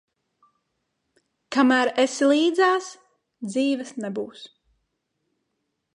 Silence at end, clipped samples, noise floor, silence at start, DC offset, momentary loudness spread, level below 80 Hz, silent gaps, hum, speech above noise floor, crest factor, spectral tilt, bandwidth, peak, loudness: 1.5 s; under 0.1%; -77 dBFS; 1.5 s; under 0.1%; 18 LU; -76 dBFS; none; none; 56 dB; 20 dB; -3.5 dB/octave; 11 kHz; -6 dBFS; -22 LUFS